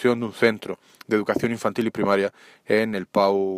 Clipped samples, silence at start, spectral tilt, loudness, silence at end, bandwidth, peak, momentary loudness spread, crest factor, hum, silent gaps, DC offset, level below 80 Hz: under 0.1%; 0 s; -6 dB/octave; -23 LUFS; 0 s; 15.5 kHz; -4 dBFS; 8 LU; 18 dB; none; none; under 0.1%; -64 dBFS